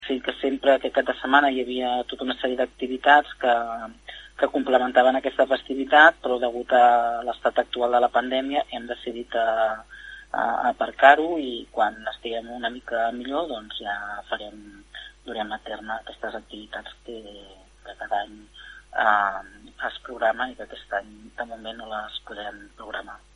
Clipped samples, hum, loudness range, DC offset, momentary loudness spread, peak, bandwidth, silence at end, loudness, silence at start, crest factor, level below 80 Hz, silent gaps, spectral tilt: under 0.1%; none; 14 LU; under 0.1%; 20 LU; 0 dBFS; 10.5 kHz; 0.2 s; -23 LUFS; 0 s; 24 dB; -56 dBFS; none; -4 dB/octave